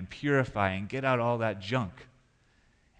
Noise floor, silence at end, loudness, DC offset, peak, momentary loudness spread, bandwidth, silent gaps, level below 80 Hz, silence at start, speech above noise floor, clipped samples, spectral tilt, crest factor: -66 dBFS; 0.95 s; -30 LUFS; under 0.1%; -12 dBFS; 5 LU; 9.2 kHz; none; -60 dBFS; 0 s; 36 dB; under 0.1%; -7 dB/octave; 20 dB